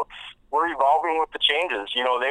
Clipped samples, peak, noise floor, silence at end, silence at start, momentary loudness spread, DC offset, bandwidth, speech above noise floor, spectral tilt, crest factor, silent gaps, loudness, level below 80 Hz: under 0.1%; -6 dBFS; -43 dBFS; 0 s; 0 s; 8 LU; under 0.1%; 11 kHz; 21 dB; -2 dB/octave; 18 dB; none; -22 LUFS; -58 dBFS